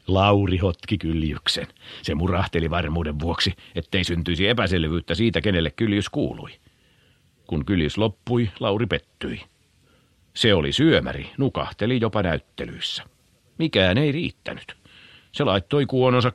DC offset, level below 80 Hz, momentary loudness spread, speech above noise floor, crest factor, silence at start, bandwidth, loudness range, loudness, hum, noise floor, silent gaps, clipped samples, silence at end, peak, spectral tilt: under 0.1%; -40 dBFS; 14 LU; 37 dB; 20 dB; 0.1 s; 12 kHz; 3 LU; -23 LUFS; none; -60 dBFS; none; under 0.1%; 0 s; -4 dBFS; -6 dB/octave